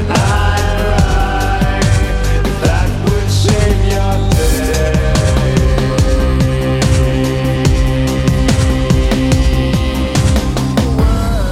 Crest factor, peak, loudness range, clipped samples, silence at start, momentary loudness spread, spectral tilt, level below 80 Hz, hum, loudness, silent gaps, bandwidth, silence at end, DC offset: 12 dB; 0 dBFS; 1 LU; under 0.1%; 0 s; 2 LU; -6 dB/octave; -16 dBFS; none; -13 LUFS; none; 16 kHz; 0 s; under 0.1%